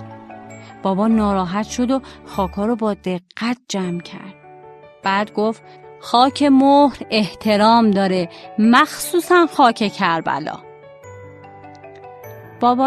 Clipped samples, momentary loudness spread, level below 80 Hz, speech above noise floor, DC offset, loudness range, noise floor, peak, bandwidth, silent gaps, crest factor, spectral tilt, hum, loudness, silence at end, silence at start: under 0.1%; 23 LU; -48 dBFS; 25 dB; under 0.1%; 8 LU; -42 dBFS; 0 dBFS; 13 kHz; none; 18 dB; -5 dB/octave; none; -17 LUFS; 0 s; 0 s